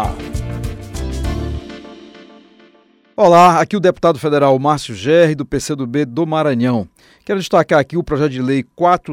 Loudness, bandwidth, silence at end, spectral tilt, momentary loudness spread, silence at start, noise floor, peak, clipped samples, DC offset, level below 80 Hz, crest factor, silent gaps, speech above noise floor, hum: -15 LUFS; 16 kHz; 0 s; -6 dB/octave; 16 LU; 0 s; -51 dBFS; -2 dBFS; under 0.1%; under 0.1%; -32 dBFS; 14 dB; none; 37 dB; none